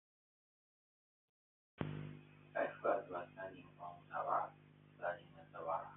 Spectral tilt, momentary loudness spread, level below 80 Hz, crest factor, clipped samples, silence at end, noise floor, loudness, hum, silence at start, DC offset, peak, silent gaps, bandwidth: -1.5 dB/octave; 14 LU; -80 dBFS; 22 dB; under 0.1%; 0 s; -64 dBFS; -44 LUFS; 50 Hz at -65 dBFS; 1.8 s; under 0.1%; -24 dBFS; none; 3.9 kHz